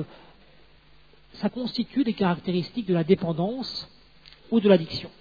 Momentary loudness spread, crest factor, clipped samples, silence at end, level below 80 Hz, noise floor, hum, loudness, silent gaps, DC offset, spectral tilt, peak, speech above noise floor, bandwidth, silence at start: 13 LU; 22 dB; under 0.1%; 0.1 s; -58 dBFS; -56 dBFS; none; -25 LUFS; none; 0.1%; -8 dB/octave; -4 dBFS; 32 dB; 5 kHz; 0 s